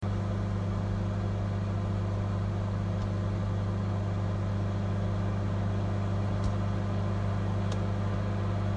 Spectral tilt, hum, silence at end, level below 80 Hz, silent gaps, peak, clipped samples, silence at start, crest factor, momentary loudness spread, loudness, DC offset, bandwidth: -8 dB/octave; 50 Hz at -30 dBFS; 0 s; -42 dBFS; none; -18 dBFS; under 0.1%; 0 s; 12 dB; 1 LU; -31 LUFS; under 0.1%; 8 kHz